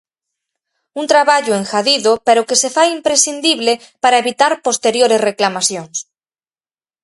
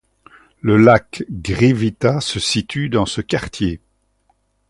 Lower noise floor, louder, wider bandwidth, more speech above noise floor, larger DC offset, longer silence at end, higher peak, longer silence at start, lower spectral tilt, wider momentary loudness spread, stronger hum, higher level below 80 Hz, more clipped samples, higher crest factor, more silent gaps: first, under -90 dBFS vs -63 dBFS; first, -13 LUFS vs -17 LUFS; about the same, 11.5 kHz vs 11.5 kHz; first, over 76 dB vs 47 dB; neither; about the same, 1 s vs 0.95 s; about the same, 0 dBFS vs 0 dBFS; first, 0.95 s vs 0.65 s; second, -1.5 dB/octave vs -5.5 dB/octave; second, 5 LU vs 12 LU; neither; second, -64 dBFS vs -40 dBFS; neither; about the same, 16 dB vs 18 dB; neither